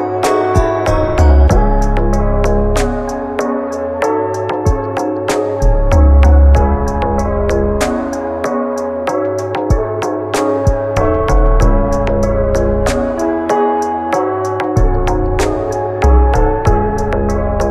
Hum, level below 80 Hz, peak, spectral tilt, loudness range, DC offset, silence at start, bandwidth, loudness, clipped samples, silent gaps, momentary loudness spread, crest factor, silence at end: none; -16 dBFS; 0 dBFS; -7 dB/octave; 4 LU; under 0.1%; 0 s; 12.5 kHz; -14 LUFS; under 0.1%; none; 7 LU; 12 dB; 0 s